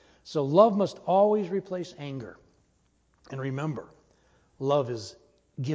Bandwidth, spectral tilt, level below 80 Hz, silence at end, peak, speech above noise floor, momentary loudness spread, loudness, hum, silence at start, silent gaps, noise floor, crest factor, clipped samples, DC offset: 8 kHz; -7.5 dB/octave; -68 dBFS; 0 s; -6 dBFS; 42 dB; 19 LU; -27 LUFS; none; 0.25 s; none; -68 dBFS; 22 dB; under 0.1%; under 0.1%